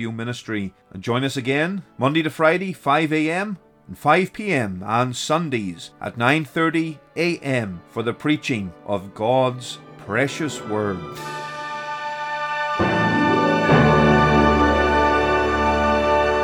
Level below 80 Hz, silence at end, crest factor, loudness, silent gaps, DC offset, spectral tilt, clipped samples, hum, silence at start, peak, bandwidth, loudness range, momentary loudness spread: -38 dBFS; 0 s; 18 dB; -20 LUFS; none; under 0.1%; -6 dB/octave; under 0.1%; none; 0 s; -2 dBFS; 17.5 kHz; 8 LU; 14 LU